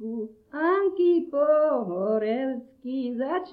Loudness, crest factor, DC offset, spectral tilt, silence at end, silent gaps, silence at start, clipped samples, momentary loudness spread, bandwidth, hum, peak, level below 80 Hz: -25 LUFS; 14 dB; under 0.1%; -9.5 dB/octave; 0 s; none; 0 s; under 0.1%; 12 LU; 4.9 kHz; none; -12 dBFS; -72 dBFS